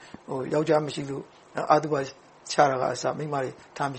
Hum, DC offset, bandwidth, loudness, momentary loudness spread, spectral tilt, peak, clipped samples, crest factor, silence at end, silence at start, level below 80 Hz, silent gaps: none; under 0.1%; 8.8 kHz; -27 LUFS; 14 LU; -5 dB/octave; -4 dBFS; under 0.1%; 22 dB; 0 s; 0 s; -66 dBFS; none